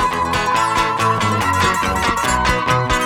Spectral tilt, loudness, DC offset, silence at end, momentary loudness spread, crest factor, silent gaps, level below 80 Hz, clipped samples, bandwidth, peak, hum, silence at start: -4 dB/octave; -16 LUFS; under 0.1%; 0 s; 1 LU; 14 dB; none; -32 dBFS; under 0.1%; 18 kHz; -2 dBFS; none; 0 s